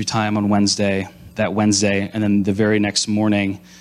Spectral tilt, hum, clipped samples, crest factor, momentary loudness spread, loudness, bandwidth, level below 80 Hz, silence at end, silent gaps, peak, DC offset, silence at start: -4.5 dB/octave; none; under 0.1%; 12 dB; 7 LU; -18 LUFS; 12.5 kHz; -54 dBFS; 0.25 s; none; -6 dBFS; under 0.1%; 0 s